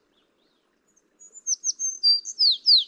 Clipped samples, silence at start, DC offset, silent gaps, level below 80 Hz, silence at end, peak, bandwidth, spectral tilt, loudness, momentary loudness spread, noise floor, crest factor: under 0.1%; 1.35 s; under 0.1%; none; -88 dBFS; 0 s; -8 dBFS; 10.5 kHz; 6 dB/octave; -20 LUFS; 10 LU; -68 dBFS; 18 dB